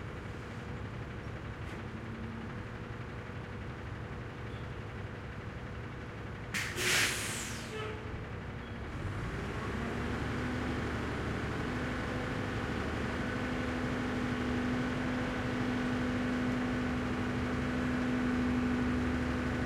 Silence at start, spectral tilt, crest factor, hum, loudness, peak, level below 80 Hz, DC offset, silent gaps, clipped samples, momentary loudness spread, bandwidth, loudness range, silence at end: 0 s; -5 dB/octave; 18 dB; none; -36 LUFS; -18 dBFS; -48 dBFS; under 0.1%; none; under 0.1%; 11 LU; 16.5 kHz; 9 LU; 0 s